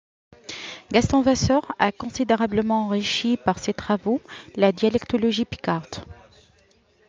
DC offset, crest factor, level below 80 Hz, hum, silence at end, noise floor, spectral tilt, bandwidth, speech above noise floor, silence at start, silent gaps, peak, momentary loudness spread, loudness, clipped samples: under 0.1%; 20 dB; -50 dBFS; none; 0.95 s; -60 dBFS; -5 dB/octave; 7.8 kHz; 38 dB; 0.5 s; none; -4 dBFS; 15 LU; -22 LUFS; under 0.1%